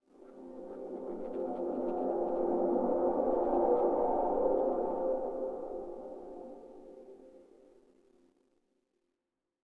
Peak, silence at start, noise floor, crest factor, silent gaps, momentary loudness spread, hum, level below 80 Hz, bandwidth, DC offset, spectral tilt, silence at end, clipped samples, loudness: -18 dBFS; 0.2 s; -88 dBFS; 16 dB; none; 20 LU; none; -60 dBFS; 3.5 kHz; under 0.1%; -9.5 dB/octave; 2.2 s; under 0.1%; -33 LUFS